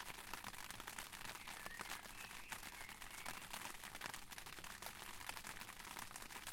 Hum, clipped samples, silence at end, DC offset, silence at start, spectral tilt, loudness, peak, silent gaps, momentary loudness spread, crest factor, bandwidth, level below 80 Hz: none; under 0.1%; 0 s; under 0.1%; 0 s; -1 dB/octave; -51 LUFS; -26 dBFS; none; 3 LU; 26 dB; 17 kHz; -66 dBFS